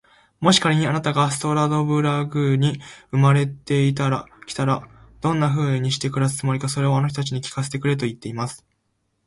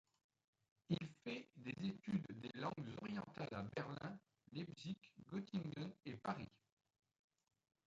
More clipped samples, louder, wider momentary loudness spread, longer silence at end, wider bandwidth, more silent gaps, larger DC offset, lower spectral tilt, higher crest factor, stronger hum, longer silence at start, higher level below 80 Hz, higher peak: neither; first, -21 LUFS vs -49 LUFS; first, 10 LU vs 7 LU; second, 0.7 s vs 1.35 s; first, 11.5 kHz vs 7.8 kHz; neither; neither; second, -5.5 dB/octave vs -7 dB/octave; about the same, 20 dB vs 22 dB; neither; second, 0.4 s vs 0.9 s; first, -54 dBFS vs -78 dBFS; first, -2 dBFS vs -28 dBFS